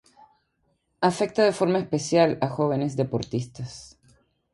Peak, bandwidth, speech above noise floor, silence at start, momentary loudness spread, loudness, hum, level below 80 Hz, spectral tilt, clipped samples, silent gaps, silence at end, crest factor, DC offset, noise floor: -4 dBFS; 11.5 kHz; 48 dB; 1 s; 15 LU; -24 LUFS; none; -60 dBFS; -6 dB/octave; under 0.1%; none; 0.65 s; 20 dB; under 0.1%; -71 dBFS